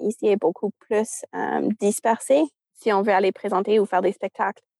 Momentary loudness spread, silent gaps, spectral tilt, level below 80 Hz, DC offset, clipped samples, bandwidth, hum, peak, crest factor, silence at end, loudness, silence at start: 8 LU; none; -5 dB/octave; -82 dBFS; under 0.1%; under 0.1%; 12.5 kHz; none; -6 dBFS; 16 dB; 0.3 s; -23 LUFS; 0 s